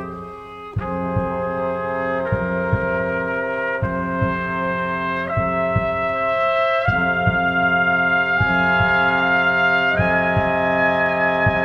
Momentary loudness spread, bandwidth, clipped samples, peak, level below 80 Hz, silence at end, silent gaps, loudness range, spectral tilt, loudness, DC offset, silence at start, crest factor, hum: 7 LU; 6.8 kHz; under 0.1%; -4 dBFS; -40 dBFS; 0 s; none; 5 LU; -8 dB/octave; -19 LUFS; under 0.1%; 0 s; 14 dB; none